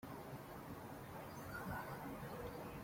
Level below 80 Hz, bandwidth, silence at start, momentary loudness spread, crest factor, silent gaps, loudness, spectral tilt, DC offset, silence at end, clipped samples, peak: -66 dBFS; 16.5 kHz; 0 s; 5 LU; 14 dB; none; -50 LUFS; -6 dB/octave; under 0.1%; 0 s; under 0.1%; -36 dBFS